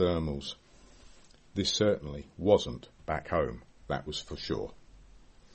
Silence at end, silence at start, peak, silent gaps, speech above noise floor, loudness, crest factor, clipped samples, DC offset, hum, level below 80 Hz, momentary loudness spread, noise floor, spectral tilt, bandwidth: 0.35 s; 0 s; -8 dBFS; none; 24 dB; -32 LUFS; 24 dB; under 0.1%; under 0.1%; none; -50 dBFS; 16 LU; -55 dBFS; -5 dB/octave; 8.4 kHz